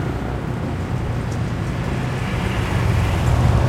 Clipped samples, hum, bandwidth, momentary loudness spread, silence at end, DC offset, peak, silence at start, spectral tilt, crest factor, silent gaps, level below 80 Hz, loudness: under 0.1%; none; 15 kHz; 6 LU; 0 s; under 0.1%; -4 dBFS; 0 s; -7 dB/octave; 14 dB; none; -28 dBFS; -22 LUFS